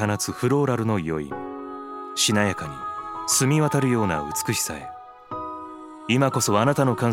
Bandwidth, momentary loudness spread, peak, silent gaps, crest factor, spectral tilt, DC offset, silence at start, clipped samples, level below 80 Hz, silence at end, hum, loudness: 16.5 kHz; 15 LU; -4 dBFS; none; 20 dB; -4.5 dB/octave; under 0.1%; 0 s; under 0.1%; -54 dBFS; 0 s; none; -23 LUFS